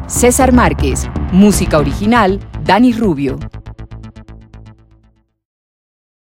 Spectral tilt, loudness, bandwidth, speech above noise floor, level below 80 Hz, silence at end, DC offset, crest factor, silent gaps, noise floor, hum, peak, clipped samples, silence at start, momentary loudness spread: -5.5 dB/octave; -12 LUFS; 16.5 kHz; 42 dB; -24 dBFS; 1.65 s; under 0.1%; 14 dB; none; -53 dBFS; none; 0 dBFS; under 0.1%; 0 s; 23 LU